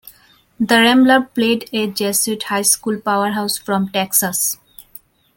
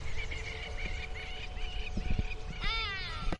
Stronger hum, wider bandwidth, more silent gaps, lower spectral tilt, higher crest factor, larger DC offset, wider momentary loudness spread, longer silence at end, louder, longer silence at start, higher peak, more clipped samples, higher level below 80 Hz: neither; first, 17 kHz vs 10 kHz; neither; second, -2.5 dB/octave vs -4.5 dB/octave; about the same, 16 dB vs 16 dB; neither; about the same, 9 LU vs 8 LU; first, 0.85 s vs 0 s; first, -16 LUFS vs -38 LUFS; about the same, 0.05 s vs 0 s; first, -2 dBFS vs -18 dBFS; neither; second, -60 dBFS vs -38 dBFS